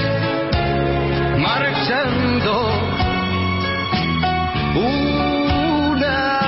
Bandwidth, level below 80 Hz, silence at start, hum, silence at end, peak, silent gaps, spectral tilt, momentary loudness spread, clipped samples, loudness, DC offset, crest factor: 5.8 kHz; -32 dBFS; 0 s; none; 0 s; -6 dBFS; none; -10 dB/octave; 2 LU; under 0.1%; -18 LUFS; under 0.1%; 12 dB